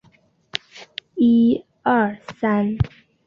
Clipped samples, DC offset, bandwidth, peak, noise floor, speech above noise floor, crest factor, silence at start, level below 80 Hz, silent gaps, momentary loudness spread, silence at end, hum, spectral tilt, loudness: under 0.1%; under 0.1%; 6.8 kHz; -2 dBFS; -57 dBFS; 39 dB; 20 dB; 0.55 s; -42 dBFS; none; 16 LU; 0.4 s; none; -7.5 dB/octave; -20 LUFS